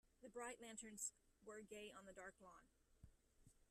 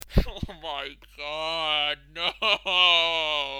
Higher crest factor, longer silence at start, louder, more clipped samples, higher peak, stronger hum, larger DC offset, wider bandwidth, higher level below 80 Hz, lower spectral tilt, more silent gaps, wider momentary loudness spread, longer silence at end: about the same, 24 dB vs 20 dB; about the same, 0.05 s vs 0.05 s; second, -56 LUFS vs -23 LUFS; neither; second, -36 dBFS vs -6 dBFS; second, none vs 50 Hz at -55 dBFS; neither; second, 13.5 kHz vs over 20 kHz; second, -78 dBFS vs -36 dBFS; second, -2 dB/octave vs -3.5 dB/octave; neither; second, 14 LU vs 17 LU; about the same, 0.05 s vs 0 s